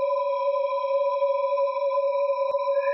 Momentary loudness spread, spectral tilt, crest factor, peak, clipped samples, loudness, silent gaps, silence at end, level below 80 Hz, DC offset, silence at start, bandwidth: 1 LU; -4 dB/octave; 10 dB; -14 dBFS; under 0.1%; -25 LUFS; none; 0 s; -86 dBFS; under 0.1%; 0 s; 5.8 kHz